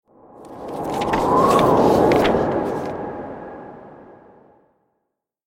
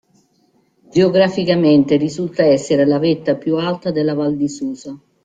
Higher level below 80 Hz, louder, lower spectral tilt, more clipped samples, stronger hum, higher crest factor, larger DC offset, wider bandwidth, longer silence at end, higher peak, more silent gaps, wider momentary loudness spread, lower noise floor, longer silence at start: first, -44 dBFS vs -56 dBFS; about the same, -18 LUFS vs -16 LUFS; about the same, -6 dB/octave vs -6.5 dB/octave; neither; neither; about the same, 18 dB vs 14 dB; neither; first, 17 kHz vs 8.8 kHz; first, 1.5 s vs 0.3 s; about the same, -2 dBFS vs -2 dBFS; neither; first, 21 LU vs 9 LU; first, -77 dBFS vs -59 dBFS; second, 0.4 s vs 0.95 s